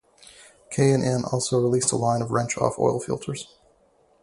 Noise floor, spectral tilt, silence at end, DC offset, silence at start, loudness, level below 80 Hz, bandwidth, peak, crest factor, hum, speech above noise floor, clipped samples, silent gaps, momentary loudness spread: -61 dBFS; -5 dB/octave; 0.75 s; under 0.1%; 0.4 s; -24 LUFS; -56 dBFS; 11.5 kHz; -4 dBFS; 20 dB; none; 38 dB; under 0.1%; none; 12 LU